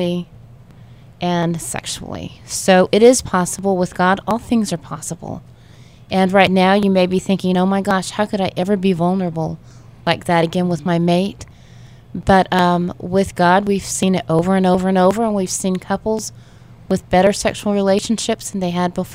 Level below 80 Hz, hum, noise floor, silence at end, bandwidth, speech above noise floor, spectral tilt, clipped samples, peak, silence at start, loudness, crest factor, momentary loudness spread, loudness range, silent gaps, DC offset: -44 dBFS; none; -43 dBFS; 0 s; 16 kHz; 26 dB; -5 dB/octave; under 0.1%; 0 dBFS; 0 s; -17 LUFS; 18 dB; 12 LU; 3 LU; none; 0.2%